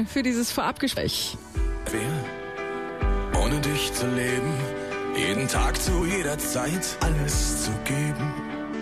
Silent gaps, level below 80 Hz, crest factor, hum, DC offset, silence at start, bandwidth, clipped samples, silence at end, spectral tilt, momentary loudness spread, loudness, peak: none; -32 dBFS; 14 dB; none; 0.1%; 0 s; 15 kHz; under 0.1%; 0 s; -4 dB/octave; 7 LU; -26 LUFS; -12 dBFS